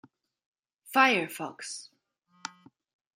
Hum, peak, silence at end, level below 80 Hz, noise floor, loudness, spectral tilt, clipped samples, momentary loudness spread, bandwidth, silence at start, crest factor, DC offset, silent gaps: none; -6 dBFS; 0.7 s; -84 dBFS; -69 dBFS; -27 LUFS; -2.5 dB/octave; under 0.1%; 21 LU; 16 kHz; 0.85 s; 26 dB; under 0.1%; none